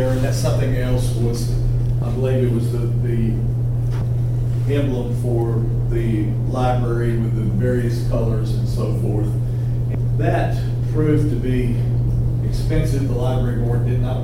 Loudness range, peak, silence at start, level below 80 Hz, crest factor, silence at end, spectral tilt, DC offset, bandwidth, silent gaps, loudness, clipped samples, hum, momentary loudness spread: 1 LU; -6 dBFS; 0 s; -26 dBFS; 12 dB; 0 s; -8 dB/octave; under 0.1%; 12 kHz; none; -20 LUFS; under 0.1%; none; 2 LU